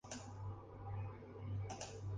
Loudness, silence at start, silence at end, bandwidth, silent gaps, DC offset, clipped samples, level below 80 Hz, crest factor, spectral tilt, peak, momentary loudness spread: -49 LUFS; 0.05 s; 0 s; 9.8 kHz; none; under 0.1%; under 0.1%; -60 dBFS; 14 dB; -5.5 dB/octave; -32 dBFS; 5 LU